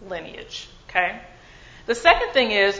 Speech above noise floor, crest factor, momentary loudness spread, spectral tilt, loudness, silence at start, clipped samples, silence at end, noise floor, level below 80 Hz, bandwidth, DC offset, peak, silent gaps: 24 dB; 22 dB; 19 LU; -2.5 dB/octave; -20 LUFS; 0 s; under 0.1%; 0 s; -46 dBFS; -46 dBFS; 8 kHz; under 0.1%; 0 dBFS; none